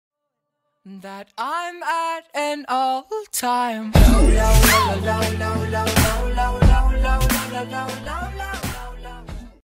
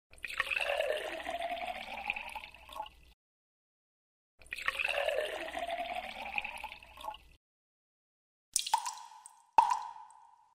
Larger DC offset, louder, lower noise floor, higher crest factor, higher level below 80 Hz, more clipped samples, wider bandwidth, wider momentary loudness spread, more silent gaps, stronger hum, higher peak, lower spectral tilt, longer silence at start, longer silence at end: neither; first, -20 LUFS vs -35 LUFS; first, -78 dBFS vs -60 dBFS; second, 18 dB vs 26 dB; first, -22 dBFS vs -64 dBFS; neither; about the same, 16.5 kHz vs 16 kHz; first, 21 LU vs 15 LU; second, none vs 3.14-4.38 s, 7.37-8.52 s; neither; first, 0 dBFS vs -12 dBFS; first, -4.5 dB/octave vs 0 dB/octave; first, 0.85 s vs 0.1 s; about the same, 0.2 s vs 0.3 s